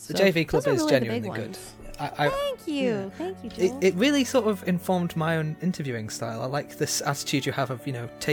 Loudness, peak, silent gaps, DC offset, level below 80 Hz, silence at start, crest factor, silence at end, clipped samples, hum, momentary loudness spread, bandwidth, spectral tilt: -26 LUFS; -6 dBFS; none; under 0.1%; -54 dBFS; 0 s; 20 dB; 0 s; under 0.1%; none; 12 LU; 19.5 kHz; -5 dB/octave